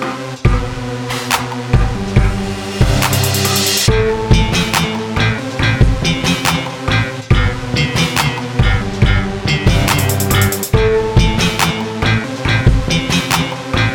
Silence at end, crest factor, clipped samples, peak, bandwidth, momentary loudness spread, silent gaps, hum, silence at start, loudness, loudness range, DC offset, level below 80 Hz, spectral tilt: 0 s; 14 dB; under 0.1%; 0 dBFS; over 20 kHz; 4 LU; none; none; 0 s; -15 LUFS; 2 LU; under 0.1%; -22 dBFS; -4.5 dB/octave